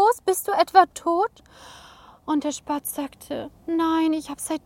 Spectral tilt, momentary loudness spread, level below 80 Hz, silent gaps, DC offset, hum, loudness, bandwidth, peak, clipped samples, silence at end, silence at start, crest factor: -3 dB/octave; 15 LU; -60 dBFS; none; under 0.1%; none; -23 LUFS; 17 kHz; -2 dBFS; under 0.1%; 0.05 s; 0 s; 22 dB